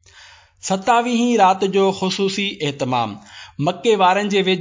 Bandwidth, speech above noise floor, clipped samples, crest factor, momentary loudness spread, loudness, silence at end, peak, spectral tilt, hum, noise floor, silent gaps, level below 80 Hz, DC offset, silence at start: 7.6 kHz; 29 dB; under 0.1%; 14 dB; 9 LU; -18 LUFS; 0 s; -4 dBFS; -4.5 dB/octave; none; -46 dBFS; none; -60 dBFS; under 0.1%; 0.65 s